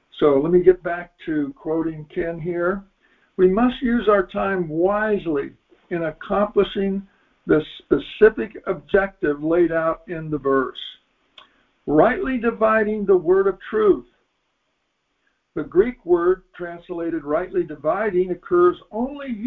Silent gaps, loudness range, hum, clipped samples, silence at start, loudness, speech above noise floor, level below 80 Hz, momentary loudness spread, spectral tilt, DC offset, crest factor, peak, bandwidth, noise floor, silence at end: none; 3 LU; none; under 0.1%; 0.15 s; -21 LUFS; 52 dB; -48 dBFS; 12 LU; -9.5 dB/octave; under 0.1%; 20 dB; -2 dBFS; 4.1 kHz; -72 dBFS; 0 s